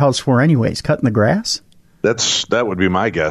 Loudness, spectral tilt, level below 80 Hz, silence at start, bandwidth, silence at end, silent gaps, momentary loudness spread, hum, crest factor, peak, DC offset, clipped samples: -16 LUFS; -4.5 dB/octave; -44 dBFS; 0 s; 13 kHz; 0 s; none; 6 LU; none; 12 dB; -4 dBFS; under 0.1%; under 0.1%